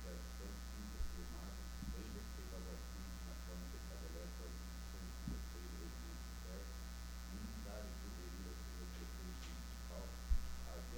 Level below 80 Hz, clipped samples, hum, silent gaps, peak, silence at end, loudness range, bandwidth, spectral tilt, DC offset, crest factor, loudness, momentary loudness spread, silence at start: -48 dBFS; under 0.1%; none; none; -26 dBFS; 0 s; 1 LU; 19 kHz; -4.5 dB/octave; under 0.1%; 22 dB; -51 LUFS; 3 LU; 0 s